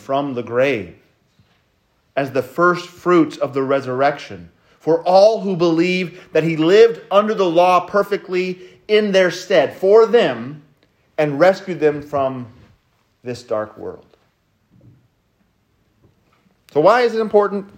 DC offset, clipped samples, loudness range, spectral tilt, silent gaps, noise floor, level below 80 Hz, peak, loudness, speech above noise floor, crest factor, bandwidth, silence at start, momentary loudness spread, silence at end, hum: under 0.1%; under 0.1%; 13 LU; -6 dB/octave; none; -62 dBFS; -64 dBFS; 0 dBFS; -16 LUFS; 46 dB; 18 dB; 16 kHz; 0.1 s; 18 LU; 0.15 s; none